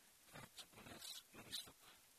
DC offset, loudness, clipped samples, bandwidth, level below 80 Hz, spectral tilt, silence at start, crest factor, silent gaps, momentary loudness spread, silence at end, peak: under 0.1%; -55 LUFS; under 0.1%; 14 kHz; -80 dBFS; -1.5 dB/octave; 0 s; 22 dB; none; 10 LU; 0 s; -36 dBFS